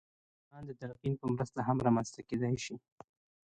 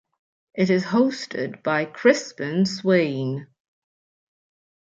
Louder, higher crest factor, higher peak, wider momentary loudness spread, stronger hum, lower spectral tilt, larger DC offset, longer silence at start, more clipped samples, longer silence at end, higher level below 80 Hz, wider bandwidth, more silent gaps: second, -35 LUFS vs -22 LUFS; about the same, 20 dB vs 20 dB; second, -16 dBFS vs -4 dBFS; first, 17 LU vs 10 LU; neither; about the same, -6.5 dB/octave vs -6 dB/octave; neither; about the same, 0.55 s vs 0.55 s; neither; second, 0.65 s vs 1.35 s; first, -64 dBFS vs -70 dBFS; first, 9.2 kHz vs 7.8 kHz; neither